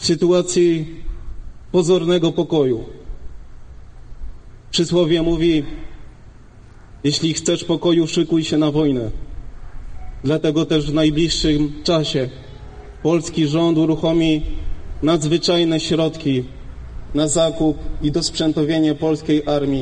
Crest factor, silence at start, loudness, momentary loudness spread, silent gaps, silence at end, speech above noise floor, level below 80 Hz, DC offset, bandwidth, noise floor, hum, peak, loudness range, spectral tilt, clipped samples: 14 dB; 0 s; -18 LUFS; 20 LU; none; 0 s; 24 dB; -34 dBFS; under 0.1%; 10 kHz; -41 dBFS; none; -4 dBFS; 3 LU; -5.5 dB/octave; under 0.1%